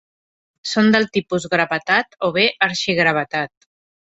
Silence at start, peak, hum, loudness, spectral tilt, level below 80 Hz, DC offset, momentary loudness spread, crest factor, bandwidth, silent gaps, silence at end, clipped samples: 0.65 s; 0 dBFS; none; -18 LUFS; -4.5 dB/octave; -60 dBFS; under 0.1%; 9 LU; 20 dB; 8 kHz; none; 0.7 s; under 0.1%